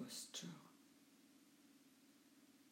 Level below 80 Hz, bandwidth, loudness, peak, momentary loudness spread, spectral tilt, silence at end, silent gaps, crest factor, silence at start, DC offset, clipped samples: under -90 dBFS; 16 kHz; -53 LUFS; -38 dBFS; 19 LU; -2.5 dB/octave; 0 s; none; 22 dB; 0 s; under 0.1%; under 0.1%